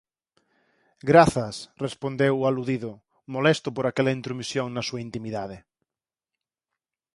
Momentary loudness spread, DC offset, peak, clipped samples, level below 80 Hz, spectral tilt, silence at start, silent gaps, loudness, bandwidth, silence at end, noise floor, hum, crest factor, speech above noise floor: 16 LU; under 0.1%; -2 dBFS; under 0.1%; -56 dBFS; -6 dB/octave; 1.05 s; none; -25 LUFS; 11.5 kHz; 1.55 s; under -90 dBFS; none; 24 dB; over 66 dB